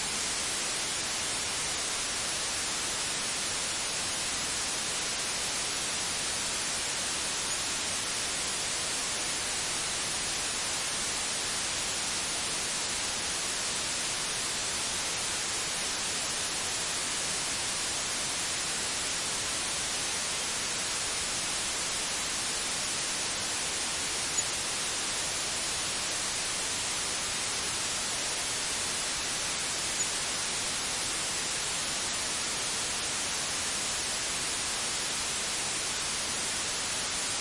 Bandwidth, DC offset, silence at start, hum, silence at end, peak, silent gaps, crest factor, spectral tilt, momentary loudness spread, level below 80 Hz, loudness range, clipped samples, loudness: 11.5 kHz; under 0.1%; 0 s; none; 0 s; -16 dBFS; none; 16 dB; 0 dB/octave; 0 LU; -56 dBFS; 0 LU; under 0.1%; -29 LUFS